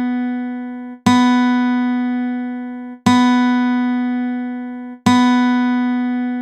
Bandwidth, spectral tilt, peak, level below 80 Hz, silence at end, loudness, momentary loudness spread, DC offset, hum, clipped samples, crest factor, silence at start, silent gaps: 10 kHz; -5 dB/octave; 0 dBFS; -62 dBFS; 0 s; -17 LUFS; 13 LU; under 0.1%; none; under 0.1%; 16 dB; 0 s; none